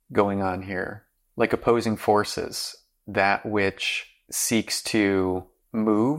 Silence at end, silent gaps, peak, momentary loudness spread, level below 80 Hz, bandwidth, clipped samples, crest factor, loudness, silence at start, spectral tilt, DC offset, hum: 0 s; none; -6 dBFS; 10 LU; -58 dBFS; 16.5 kHz; under 0.1%; 18 dB; -25 LUFS; 0.1 s; -4 dB/octave; under 0.1%; none